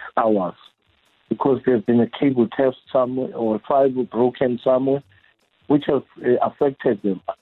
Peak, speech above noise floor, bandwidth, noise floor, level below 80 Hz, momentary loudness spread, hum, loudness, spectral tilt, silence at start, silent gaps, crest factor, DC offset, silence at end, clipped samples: -6 dBFS; 43 dB; 4.2 kHz; -62 dBFS; -60 dBFS; 6 LU; none; -21 LUFS; -10 dB/octave; 0 s; none; 14 dB; under 0.1%; 0.05 s; under 0.1%